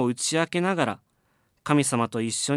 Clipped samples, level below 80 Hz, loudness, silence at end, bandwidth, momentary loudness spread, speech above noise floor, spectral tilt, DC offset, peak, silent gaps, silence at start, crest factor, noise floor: under 0.1%; -70 dBFS; -25 LUFS; 0 s; 14.5 kHz; 8 LU; 44 dB; -4 dB/octave; under 0.1%; -6 dBFS; none; 0 s; 20 dB; -69 dBFS